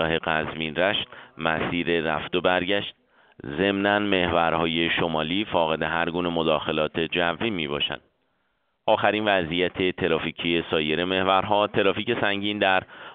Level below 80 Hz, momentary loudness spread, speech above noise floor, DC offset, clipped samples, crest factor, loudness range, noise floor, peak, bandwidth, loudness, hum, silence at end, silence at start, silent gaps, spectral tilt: -52 dBFS; 6 LU; 48 dB; under 0.1%; under 0.1%; 20 dB; 2 LU; -72 dBFS; -4 dBFS; 4.7 kHz; -24 LUFS; none; 0 s; 0 s; none; -2.5 dB/octave